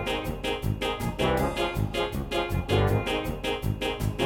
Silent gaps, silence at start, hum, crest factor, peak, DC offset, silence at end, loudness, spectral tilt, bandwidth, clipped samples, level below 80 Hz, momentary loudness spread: none; 0 s; none; 16 dB; -12 dBFS; under 0.1%; 0 s; -28 LUFS; -5.5 dB/octave; 17 kHz; under 0.1%; -38 dBFS; 5 LU